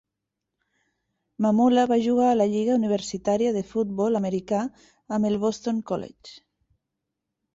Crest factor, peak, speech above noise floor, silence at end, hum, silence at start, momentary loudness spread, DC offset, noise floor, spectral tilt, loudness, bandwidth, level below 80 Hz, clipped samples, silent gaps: 16 dB; -10 dBFS; 61 dB; 1.15 s; none; 1.4 s; 9 LU; under 0.1%; -84 dBFS; -6.5 dB/octave; -24 LUFS; 8 kHz; -62 dBFS; under 0.1%; none